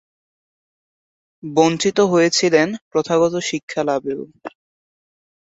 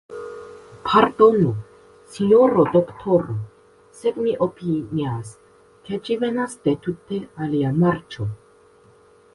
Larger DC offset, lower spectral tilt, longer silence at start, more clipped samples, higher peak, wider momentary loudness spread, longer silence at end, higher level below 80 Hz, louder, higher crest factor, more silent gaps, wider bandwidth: neither; second, -4 dB/octave vs -7.5 dB/octave; first, 1.45 s vs 0.1 s; neither; about the same, -2 dBFS vs 0 dBFS; about the same, 19 LU vs 20 LU; about the same, 1.1 s vs 1 s; second, -64 dBFS vs -54 dBFS; first, -18 LUFS vs -21 LUFS; about the same, 18 dB vs 22 dB; first, 2.81-2.91 s, 3.63-3.68 s vs none; second, 8 kHz vs 11.5 kHz